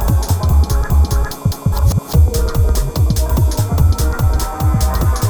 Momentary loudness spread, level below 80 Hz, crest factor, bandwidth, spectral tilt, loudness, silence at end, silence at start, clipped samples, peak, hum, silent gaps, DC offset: 3 LU; -16 dBFS; 12 dB; over 20 kHz; -6 dB/octave; -16 LUFS; 0 s; 0 s; under 0.1%; -2 dBFS; none; none; under 0.1%